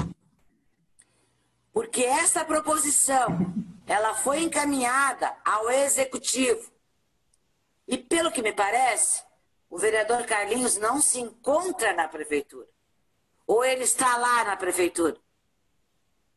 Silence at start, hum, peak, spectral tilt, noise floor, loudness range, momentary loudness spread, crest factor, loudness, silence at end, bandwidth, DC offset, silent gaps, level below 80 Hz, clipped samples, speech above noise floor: 0 s; none; -8 dBFS; -2.5 dB/octave; -74 dBFS; 3 LU; 9 LU; 20 dB; -24 LUFS; 1.2 s; 14 kHz; under 0.1%; none; -60 dBFS; under 0.1%; 49 dB